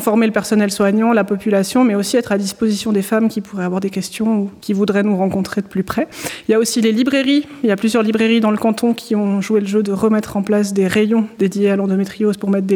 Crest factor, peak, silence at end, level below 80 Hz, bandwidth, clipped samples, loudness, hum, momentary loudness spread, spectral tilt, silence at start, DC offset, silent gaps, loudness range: 14 dB; -2 dBFS; 0 s; -54 dBFS; 18.5 kHz; under 0.1%; -16 LUFS; none; 6 LU; -5.5 dB/octave; 0 s; under 0.1%; none; 3 LU